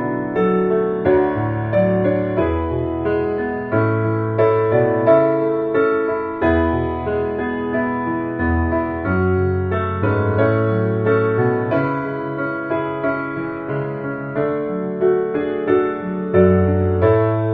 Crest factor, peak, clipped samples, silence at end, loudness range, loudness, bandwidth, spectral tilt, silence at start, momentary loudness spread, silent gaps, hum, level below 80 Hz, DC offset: 16 dB; -2 dBFS; under 0.1%; 0 s; 4 LU; -19 LUFS; 4.6 kHz; -8 dB/octave; 0 s; 7 LU; none; none; -38 dBFS; under 0.1%